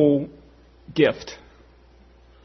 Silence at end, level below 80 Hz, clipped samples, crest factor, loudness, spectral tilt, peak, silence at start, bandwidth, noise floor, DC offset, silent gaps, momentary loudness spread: 1.1 s; -54 dBFS; under 0.1%; 20 dB; -23 LUFS; -6.5 dB/octave; -4 dBFS; 0 s; 6.4 kHz; -52 dBFS; under 0.1%; none; 19 LU